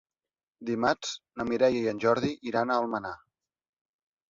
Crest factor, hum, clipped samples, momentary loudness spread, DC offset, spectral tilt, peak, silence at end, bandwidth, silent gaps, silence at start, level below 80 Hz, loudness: 22 dB; none; under 0.1%; 12 LU; under 0.1%; -5 dB/octave; -8 dBFS; 1.15 s; 7.6 kHz; none; 0.6 s; -64 dBFS; -28 LUFS